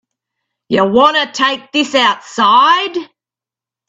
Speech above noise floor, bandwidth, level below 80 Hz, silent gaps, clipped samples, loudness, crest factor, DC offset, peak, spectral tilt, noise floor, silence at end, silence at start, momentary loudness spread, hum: 76 dB; 8.4 kHz; -60 dBFS; none; under 0.1%; -12 LUFS; 14 dB; under 0.1%; 0 dBFS; -3.5 dB/octave; -88 dBFS; 0.85 s; 0.7 s; 8 LU; none